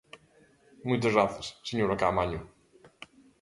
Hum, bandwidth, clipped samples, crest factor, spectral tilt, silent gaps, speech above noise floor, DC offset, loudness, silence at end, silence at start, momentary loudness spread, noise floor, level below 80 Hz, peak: none; 11.5 kHz; under 0.1%; 22 dB; -6 dB/octave; none; 34 dB; under 0.1%; -29 LUFS; 0.35 s; 0.15 s; 24 LU; -62 dBFS; -54 dBFS; -10 dBFS